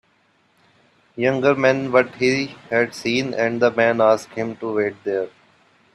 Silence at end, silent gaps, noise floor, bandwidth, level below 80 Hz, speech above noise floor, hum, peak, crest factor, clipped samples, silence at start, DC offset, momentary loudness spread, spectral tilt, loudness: 0.65 s; none; -61 dBFS; 12.5 kHz; -64 dBFS; 42 dB; none; 0 dBFS; 20 dB; under 0.1%; 1.15 s; under 0.1%; 9 LU; -5.5 dB/octave; -20 LUFS